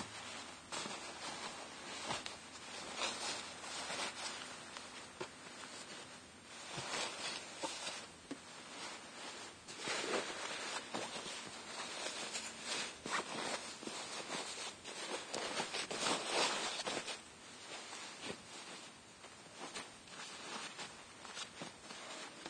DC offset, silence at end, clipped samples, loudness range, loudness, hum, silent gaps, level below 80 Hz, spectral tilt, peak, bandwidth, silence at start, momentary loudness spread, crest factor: under 0.1%; 0 s; under 0.1%; 9 LU; -43 LUFS; none; none; -78 dBFS; -1 dB/octave; -22 dBFS; 10.5 kHz; 0 s; 11 LU; 24 dB